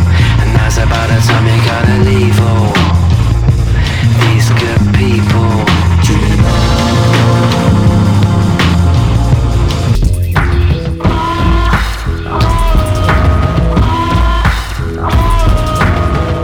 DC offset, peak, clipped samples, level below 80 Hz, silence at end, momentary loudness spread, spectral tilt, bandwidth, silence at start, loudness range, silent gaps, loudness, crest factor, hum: under 0.1%; 0 dBFS; under 0.1%; -16 dBFS; 0 s; 4 LU; -6 dB/octave; 16 kHz; 0 s; 2 LU; none; -10 LUFS; 8 dB; none